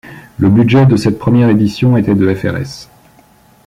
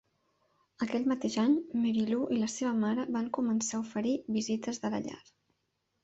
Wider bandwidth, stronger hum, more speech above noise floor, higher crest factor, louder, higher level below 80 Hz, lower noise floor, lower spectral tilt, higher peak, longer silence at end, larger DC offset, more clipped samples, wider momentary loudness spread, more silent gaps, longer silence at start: first, 12 kHz vs 8.2 kHz; neither; second, 36 dB vs 49 dB; about the same, 10 dB vs 14 dB; first, -11 LUFS vs -32 LUFS; first, -42 dBFS vs -72 dBFS; second, -46 dBFS vs -80 dBFS; first, -8 dB/octave vs -4.5 dB/octave; first, -2 dBFS vs -18 dBFS; about the same, 0.85 s vs 0.85 s; neither; neither; first, 14 LU vs 6 LU; neither; second, 0.05 s vs 0.8 s